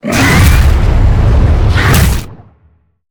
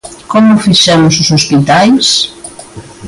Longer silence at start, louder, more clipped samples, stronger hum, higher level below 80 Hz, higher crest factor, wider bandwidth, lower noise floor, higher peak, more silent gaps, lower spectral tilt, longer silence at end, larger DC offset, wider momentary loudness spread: about the same, 0.05 s vs 0.05 s; about the same, -9 LUFS vs -7 LUFS; first, 0.1% vs under 0.1%; neither; first, -12 dBFS vs -42 dBFS; about the same, 8 dB vs 8 dB; first, over 20 kHz vs 11.5 kHz; first, -50 dBFS vs -29 dBFS; about the same, 0 dBFS vs 0 dBFS; neither; first, -5.5 dB/octave vs -4 dB/octave; first, 0.75 s vs 0 s; neither; second, 4 LU vs 10 LU